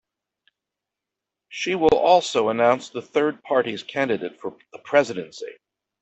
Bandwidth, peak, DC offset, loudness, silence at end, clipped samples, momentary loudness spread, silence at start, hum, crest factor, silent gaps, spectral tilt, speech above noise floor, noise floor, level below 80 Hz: 8.4 kHz; -4 dBFS; under 0.1%; -22 LUFS; 0.5 s; under 0.1%; 18 LU; 1.5 s; none; 20 dB; none; -4.5 dB/octave; 64 dB; -86 dBFS; -58 dBFS